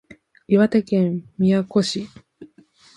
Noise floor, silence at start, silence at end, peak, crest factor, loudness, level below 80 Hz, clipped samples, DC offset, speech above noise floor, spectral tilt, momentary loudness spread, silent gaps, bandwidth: -53 dBFS; 0.5 s; 0.5 s; -4 dBFS; 18 dB; -20 LUFS; -60 dBFS; under 0.1%; under 0.1%; 34 dB; -6.5 dB/octave; 9 LU; none; 11.5 kHz